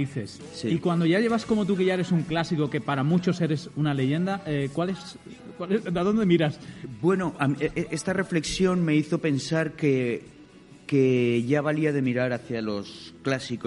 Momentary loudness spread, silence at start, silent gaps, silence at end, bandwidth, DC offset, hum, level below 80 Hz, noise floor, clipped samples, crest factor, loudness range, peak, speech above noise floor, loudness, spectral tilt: 11 LU; 0 s; none; 0 s; 11.5 kHz; under 0.1%; none; -56 dBFS; -49 dBFS; under 0.1%; 16 dB; 2 LU; -8 dBFS; 24 dB; -25 LUFS; -6.5 dB/octave